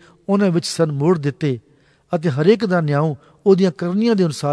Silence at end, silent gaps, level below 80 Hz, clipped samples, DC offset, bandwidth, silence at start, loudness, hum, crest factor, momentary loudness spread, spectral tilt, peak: 0 s; none; -62 dBFS; under 0.1%; under 0.1%; 11 kHz; 0.3 s; -18 LUFS; none; 16 dB; 8 LU; -7 dB/octave; -2 dBFS